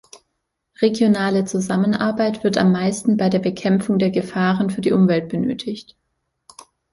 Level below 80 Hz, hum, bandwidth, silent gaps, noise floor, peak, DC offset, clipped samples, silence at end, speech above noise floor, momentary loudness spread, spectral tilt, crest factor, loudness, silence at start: -56 dBFS; none; 11.5 kHz; none; -75 dBFS; -2 dBFS; under 0.1%; under 0.1%; 1.1 s; 57 dB; 6 LU; -6.5 dB/octave; 16 dB; -19 LUFS; 0.8 s